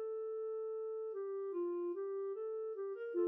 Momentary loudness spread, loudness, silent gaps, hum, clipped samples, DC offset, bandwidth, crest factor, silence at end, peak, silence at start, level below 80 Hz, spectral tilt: 3 LU; -42 LUFS; none; none; under 0.1%; under 0.1%; 3.2 kHz; 14 dB; 0 s; -28 dBFS; 0 s; under -90 dBFS; -4.5 dB/octave